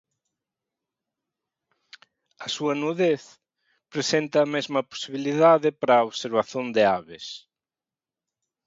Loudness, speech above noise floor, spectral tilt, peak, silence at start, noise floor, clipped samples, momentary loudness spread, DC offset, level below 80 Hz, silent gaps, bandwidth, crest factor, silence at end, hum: -23 LUFS; over 67 dB; -4.5 dB/octave; -6 dBFS; 2.4 s; under -90 dBFS; under 0.1%; 16 LU; under 0.1%; -72 dBFS; none; 7.8 kHz; 20 dB; 1.3 s; none